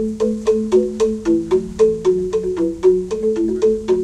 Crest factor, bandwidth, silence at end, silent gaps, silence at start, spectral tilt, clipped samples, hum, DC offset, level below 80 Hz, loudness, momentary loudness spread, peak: 14 dB; 10.5 kHz; 0 s; none; 0 s; -7 dB/octave; under 0.1%; none; under 0.1%; -42 dBFS; -18 LUFS; 4 LU; -4 dBFS